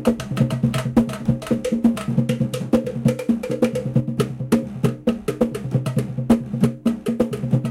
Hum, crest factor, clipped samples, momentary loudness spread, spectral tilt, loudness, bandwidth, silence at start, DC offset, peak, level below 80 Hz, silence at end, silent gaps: none; 18 dB; under 0.1%; 4 LU; -7.5 dB/octave; -22 LUFS; 15.5 kHz; 0 s; under 0.1%; -4 dBFS; -44 dBFS; 0 s; none